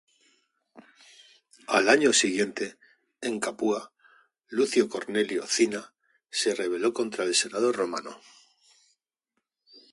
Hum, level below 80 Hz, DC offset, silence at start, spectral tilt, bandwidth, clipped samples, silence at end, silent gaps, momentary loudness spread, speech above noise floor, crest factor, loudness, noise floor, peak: none; -76 dBFS; under 0.1%; 0.75 s; -2 dB/octave; 11.5 kHz; under 0.1%; 1.75 s; none; 14 LU; 56 dB; 22 dB; -26 LUFS; -82 dBFS; -6 dBFS